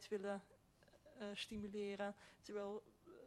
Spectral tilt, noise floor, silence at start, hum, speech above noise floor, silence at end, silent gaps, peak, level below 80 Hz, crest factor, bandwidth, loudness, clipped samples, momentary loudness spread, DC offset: -4.5 dB/octave; -71 dBFS; 0 s; none; 23 dB; 0 s; none; -34 dBFS; -76 dBFS; 16 dB; 12.5 kHz; -49 LUFS; under 0.1%; 16 LU; under 0.1%